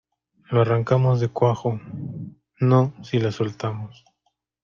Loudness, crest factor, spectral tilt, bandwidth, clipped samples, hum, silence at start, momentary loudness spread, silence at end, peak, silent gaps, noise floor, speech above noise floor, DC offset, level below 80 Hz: -22 LUFS; 18 dB; -8.5 dB/octave; 7 kHz; under 0.1%; none; 0.5 s; 15 LU; 0.75 s; -6 dBFS; none; -73 dBFS; 52 dB; under 0.1%; -58 dBFS